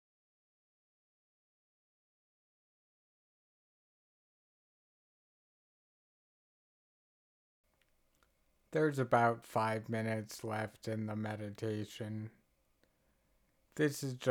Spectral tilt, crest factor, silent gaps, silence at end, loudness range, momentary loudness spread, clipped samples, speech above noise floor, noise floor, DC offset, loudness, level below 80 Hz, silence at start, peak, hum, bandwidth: -6 dB/octave; 24 dB; none; 0 s; 7 LU; 12 LU; under 0.1%; 39 dB; -75 dBFS; under 0.1%; -37 LUFS; -80 dBFS; 8.7 s; -16 dBFS; none; 19 kHz